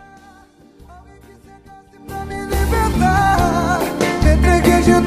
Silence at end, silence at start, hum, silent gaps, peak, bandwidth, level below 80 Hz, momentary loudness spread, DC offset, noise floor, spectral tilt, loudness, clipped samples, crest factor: 0 s; 0.9 s; none; none; -2 dBFS; 15.5 kHz; -24 dBFS; 14 LU; under 0.1%; -46 dBFS; -6 dB/octave; -16 LUFS; under 0.1%; 16 dB